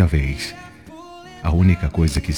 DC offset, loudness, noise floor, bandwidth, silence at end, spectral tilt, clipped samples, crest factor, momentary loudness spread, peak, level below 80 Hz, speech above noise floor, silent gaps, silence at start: 0.1%; -20 LUFS; -40 dBFS; 14.5 kHz; 0 s; -6.5 dB/octave; under 0.1%; 16 dB; 23 LU; -4 dBFS; -28 dBFS; 22 dB; none; 0 s